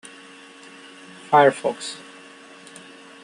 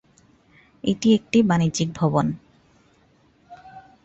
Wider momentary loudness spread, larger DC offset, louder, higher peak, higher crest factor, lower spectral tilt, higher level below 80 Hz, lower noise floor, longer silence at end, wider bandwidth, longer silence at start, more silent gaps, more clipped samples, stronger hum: first, 27 LU vs 12 LU; neither; about the same, -20 LUFS vs -21 LUFS; about the same, -4 dBFS vs -6 dBFS; about the same, 20 dB vs 18 dB; second, -4 dB/octave vs -6 dB/octave; second, -74 dBFS vs -54 dBFS; second, -45 dBFS vs -59 dBFS; first, 1.25 s vs 0.25 s; first, 11.5 kHz vs 8.2 kHz; first, 1.3 s vs 0.85 s; neither; neither; neither